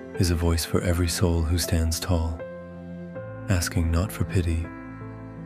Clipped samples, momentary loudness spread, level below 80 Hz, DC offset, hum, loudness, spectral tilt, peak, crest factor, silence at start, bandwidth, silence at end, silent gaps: under 0.1%; 15 LU; -34 dBFS; under 0.1%; none; -25 LUFS; -5.5 dB/octave; -8 dBFS; 18 dB; 0 s; 15.5 kHz; 0 s; none